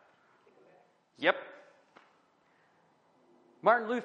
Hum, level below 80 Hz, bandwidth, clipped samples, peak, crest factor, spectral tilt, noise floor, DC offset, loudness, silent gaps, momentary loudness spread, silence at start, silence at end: none; under -90 dBFS; 7.6 kHz; under 0.1%; -10 dBFS; 26 dB; -5.5 dB/octave; -68 dBFS; under 0.1%; -30 LUFS; none; 12 LU; 1.2 s; 0 s